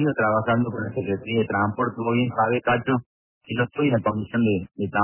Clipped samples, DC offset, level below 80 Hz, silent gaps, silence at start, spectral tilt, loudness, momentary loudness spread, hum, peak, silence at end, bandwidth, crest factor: under 0.1%; under 0.1%; -52 dBFS; 3.06-3.41 s; 0 s; -11 dB/octave; -24 LUFS; 6 LU; none; -10 dBFS; 0 s; 3.2 kHz; 14 dB